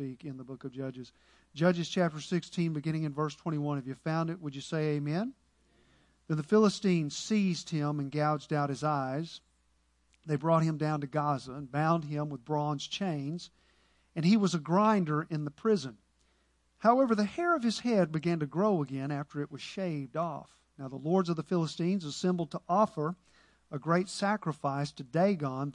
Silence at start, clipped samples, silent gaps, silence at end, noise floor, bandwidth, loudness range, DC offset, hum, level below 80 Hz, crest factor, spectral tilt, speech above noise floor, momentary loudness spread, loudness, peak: 0 s; under 0.1%; none; 0 s; -71 dBFS; 11 kHz; 4 LU; under 0.1%; none; -72 dBFS; 20 dB; -6.5 dB/octave; 40 dB; 13 LU; -31 LUFS; -12 dBFS